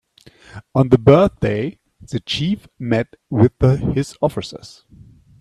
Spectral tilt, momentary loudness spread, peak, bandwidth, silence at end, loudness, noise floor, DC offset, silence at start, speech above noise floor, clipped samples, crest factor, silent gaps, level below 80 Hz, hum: -7.5 dB/octave; 16 LU; 0 dBFS; 11.5 kHz; 0.7 s; -18 LUFS; -48 dBFS; under 0.1%; 0.55 s; 30 dB; under 0.1%; 18 dB; none; -40 dBFS; none